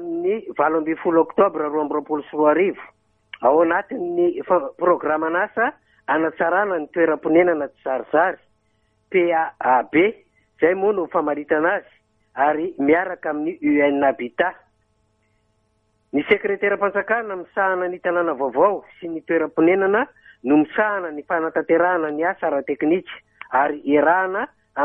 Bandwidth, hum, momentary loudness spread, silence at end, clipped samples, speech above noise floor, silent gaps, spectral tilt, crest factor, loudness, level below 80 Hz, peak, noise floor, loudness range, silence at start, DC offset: 3.7 kHz; none; 8 LU; 0 s; under 0.1%; 46 dB; none; -9 dB/octave; 18 dB; -20 LUFS; -64 dBFS; -4 dBFS; -66 dBFS; 2 LU; 0 s; under 0.1%